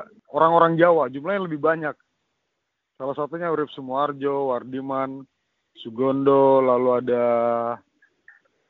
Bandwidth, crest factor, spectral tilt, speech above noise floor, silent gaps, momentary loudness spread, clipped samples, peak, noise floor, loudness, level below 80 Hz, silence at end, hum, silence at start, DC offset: 4.3 kHz; 20 dB; -5.5 dB/octave; 57 dB; none; 15 LU; under 0.1%; -2 dBFS; -78 dBFS; -22 LUFS; -70 dBFS; 0.9 s; none; 0 s; under 0.1%